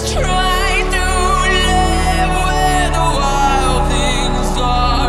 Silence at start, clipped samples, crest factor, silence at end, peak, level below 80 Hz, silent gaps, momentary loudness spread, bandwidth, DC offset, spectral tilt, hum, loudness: 0 s; under 0.1%; 12 dB; 0 s; -2 dBFS; -18 dBFS; none; 3 LU; 14 kHz; under 0.1%; -4 dB/octave; none; -15 LUFS